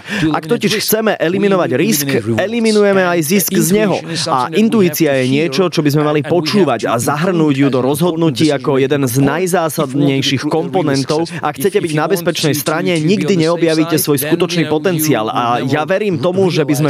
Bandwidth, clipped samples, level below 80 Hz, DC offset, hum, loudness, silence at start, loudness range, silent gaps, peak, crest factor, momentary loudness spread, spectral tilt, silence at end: 16 kHz; under 0.1%; -54 dBFS; under 0.1%; none; -14 LUFS; 0.05 s; 2 LU; none; -2 dBFS; 12 dB; 3 LU; -5 dB/octave; 0 s